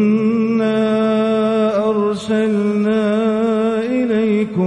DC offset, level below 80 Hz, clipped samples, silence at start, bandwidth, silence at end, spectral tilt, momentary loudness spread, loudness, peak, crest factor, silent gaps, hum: under 0.1%; -56 dBFS; under 0.1%; 0 s; 9.8 kHz; 0 s; -7.5 dB/octave; 2 LU; -16 LUFS; -6 dBFS; 10 dB; none; none